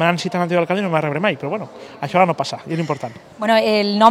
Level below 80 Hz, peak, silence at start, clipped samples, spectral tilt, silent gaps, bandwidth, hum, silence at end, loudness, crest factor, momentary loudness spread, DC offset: -66 dBFS; 0 dBFS; 0 s; under 0.1%; -6 dB/octave; none; 14 kHz; none; 0 s; -19 LUFS; 18 dB; 12 LU; under 0.1%